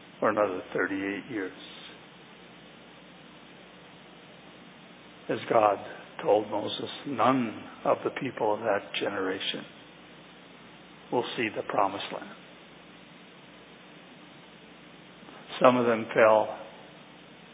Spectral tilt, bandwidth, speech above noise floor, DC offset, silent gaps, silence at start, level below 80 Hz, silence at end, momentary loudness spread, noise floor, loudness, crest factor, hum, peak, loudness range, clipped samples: -3 dB/octave; 4 kHz; 24 dB; under 0.1%; none; 0 s; -72 dBFS; 0 s; 26 LU; -51 dBFS; -28 LUFS; 26 dB; none; -4 dBFS; 19 LU; under 0.1%